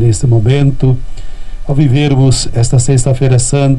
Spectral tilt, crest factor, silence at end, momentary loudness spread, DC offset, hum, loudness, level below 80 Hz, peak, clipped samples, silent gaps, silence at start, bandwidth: -6 dB/octave; 10 dB; 0 s; 7 LU; under 0.1%; none; -11 LUFS; -22 dBFS; 0 dBFS; under 0.1%; none; 0 s; 11 kHz